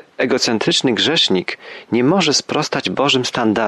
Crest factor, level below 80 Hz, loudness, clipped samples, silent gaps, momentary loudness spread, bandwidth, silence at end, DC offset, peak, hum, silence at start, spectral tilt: 14 dB; -58 dBFS; -16 LUFS; under 0.1%; none; 7 LU; 12.5 kHz; 0 s; under 0.1%; -4 dBFS; none; 0.2 s; -3.5 dB/octave